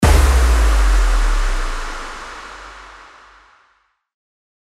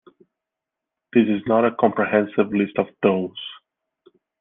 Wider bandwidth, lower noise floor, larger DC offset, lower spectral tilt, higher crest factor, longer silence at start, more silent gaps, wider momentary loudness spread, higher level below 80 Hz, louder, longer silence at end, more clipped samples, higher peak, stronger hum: first, 14 kHz vs 3.9 kHz; second, -61 dBFS vs -85 dBFS; neither; second, -5 dB/octave vs -10 dB/octave; about the same, 16 dB vs 20 dB; second, 0 s vs 1.15 s; neither; first, 21 LU vs 9 LU; first, -18 dBFS vs -64 dBFS; first, -18 LUFS vs -21 LUFS; first, 1.75 s vs 0.85 s; neither; about the same, -2 dBFS vs -2 dBFS; neither